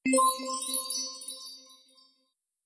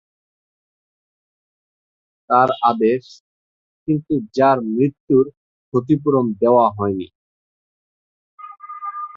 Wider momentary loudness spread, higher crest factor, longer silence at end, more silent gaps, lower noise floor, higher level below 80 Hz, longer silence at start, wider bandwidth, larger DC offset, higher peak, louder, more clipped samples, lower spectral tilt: first, 18 LU vs 15 LU; about the same, 18 dB vs 18 dB; first, 0.9 s vs 0 s; second, none vs 3.20-3.86 s, 5.00-5.07 s, 5.37-5.72 s, 7.15-8.38 s; second, -77 dBFS vs under -90 dBFS; second, -82 dBFS vs -58 dBFS; second, 0.05 s vs 2.3 s; first, 11 kHz vs 7.2 kHz; neither; second, -14 dBFS vs -2 dBFS; second, -29 LUFS vs -18 LUFS; neither; second, -0.5 dB/octave vs -8.5 dB/octave